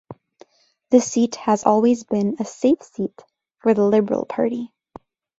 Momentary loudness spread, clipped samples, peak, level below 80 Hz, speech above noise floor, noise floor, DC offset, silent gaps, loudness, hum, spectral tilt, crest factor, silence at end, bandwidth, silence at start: 12 LU; under 0.1%; -2 dBFS; -64 dBFS; 37 dB; -56 dBFS; under 0.1%; none; -20 LUFS; none; -6 dB/octave; 20 dB; 0.75 s; 8 kHz; 0.1 s